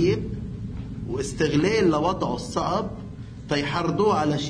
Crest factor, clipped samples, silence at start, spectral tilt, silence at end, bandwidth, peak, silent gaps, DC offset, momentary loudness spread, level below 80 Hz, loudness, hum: 16 dB; under 0.1%; 0 s; -6 dB/octave; 0 s; 10.5 kHz; -8 dBFS; none; under 0.1%; 14 LU; -42 dBFS; -25 LUFS; none